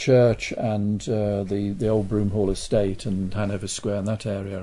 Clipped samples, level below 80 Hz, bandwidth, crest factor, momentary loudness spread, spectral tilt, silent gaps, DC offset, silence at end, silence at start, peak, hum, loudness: under 0.1%; -42 dBFS; 11 kHz; 16 dB; 6 LU; -6.5 dB/octave; none; under 0.1%; 0 s; 0 s; -8 dBFS; none; -24 LUFS